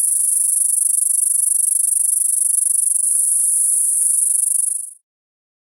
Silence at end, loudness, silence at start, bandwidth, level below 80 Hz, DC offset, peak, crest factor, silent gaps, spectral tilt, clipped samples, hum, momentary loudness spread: 0.7 s; -13 LUFS; 0 s; over 20 kHz; under -90 dBFS; under 0.1%; -2 dBFS; 16 dB; none; 9 dB/octave; under 0.1%; none; 1 LU